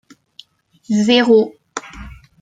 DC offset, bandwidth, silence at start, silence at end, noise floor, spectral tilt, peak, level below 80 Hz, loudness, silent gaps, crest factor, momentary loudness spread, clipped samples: under 0.1%; 9.2 kHz; 0.9 s; 0.3 s; -47 dBFS; -5 dB/octave; -2 dBFS; -46 dBFS; -14 LUFS; none; 16 dB; 23 LU; under 0.1%